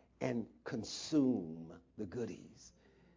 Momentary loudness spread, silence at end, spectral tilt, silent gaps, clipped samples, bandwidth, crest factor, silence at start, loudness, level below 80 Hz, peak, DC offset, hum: 21 LU; 0.45 s; -5.5 dB/octave; none; under 0.1%; 7.6 kHz; 18 dB; 0.2 s; -39 LUFS; -70 dBFS; -22 dBFS; under 0.1%; none